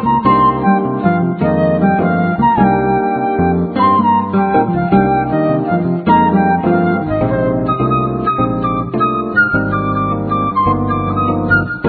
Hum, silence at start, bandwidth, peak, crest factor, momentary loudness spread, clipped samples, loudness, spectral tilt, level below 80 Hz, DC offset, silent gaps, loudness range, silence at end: none; 0 s; 4.6 kHz; 0 dBFS; 14 dB; 4 LU; under 0.1%; -14 LUFS; -11.5 dB/octave; -36 dBFS; under 0.1%; none; 2 LU; 0 s